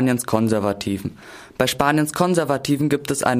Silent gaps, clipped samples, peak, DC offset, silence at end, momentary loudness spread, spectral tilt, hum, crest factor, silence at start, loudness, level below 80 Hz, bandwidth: none; under 0.1%; -2 dBFS; under 0.1%; 0 s; 10 LU; -5 dB/octave; none; 18 dB; 0 s; -20 LUFS; -50 dBFS; 15.5 kHz